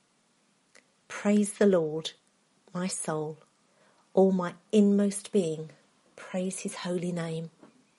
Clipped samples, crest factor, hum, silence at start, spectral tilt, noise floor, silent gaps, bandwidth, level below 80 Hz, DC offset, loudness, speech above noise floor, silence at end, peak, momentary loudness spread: under 0.1%; 20 dB; none; 1.1 s; -6 dB/octave; -69 dBFS; none; 11.5 kHz; -78 dBFS; under 0.1%; -29 LUFS; 41 dB; 0.5 s; -10 dBFS; 16 LU